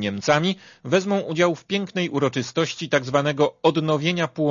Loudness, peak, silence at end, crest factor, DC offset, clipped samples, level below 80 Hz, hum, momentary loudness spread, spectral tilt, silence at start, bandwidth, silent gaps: -22 LUFS; -4 dBFS; 0 s; 18 dB; under 0.1%; under 0.1%; -64 dBFS; none; 5 LU; -5 dB/octave; 0 s; 7.4 kHz; none